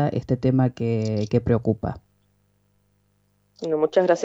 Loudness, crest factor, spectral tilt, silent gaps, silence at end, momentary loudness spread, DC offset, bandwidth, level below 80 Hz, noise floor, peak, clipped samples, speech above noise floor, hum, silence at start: -23 LUFS; 18 dB; -8 dB/octave; none; 0 s; 10 LU; under 0.1%; 7.8 kHz; -48 dBFS; -66 dBFS; -6 dBFS; under 0.1%; 44 dB; 50 Hz at -55 dBFS; 0 s